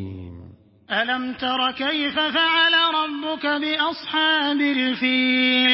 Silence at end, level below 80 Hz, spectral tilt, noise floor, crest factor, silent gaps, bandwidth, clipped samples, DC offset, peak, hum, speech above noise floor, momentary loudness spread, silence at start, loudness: 0 s; -54 dBFS; -8 dB/octave; -45 dBFS; 16 dB; none; 5.8 kHz; under 0.1%; under 0.1%; -6 dBFS; none; 25 dB; 9 LU; 0 s; -20 LUFS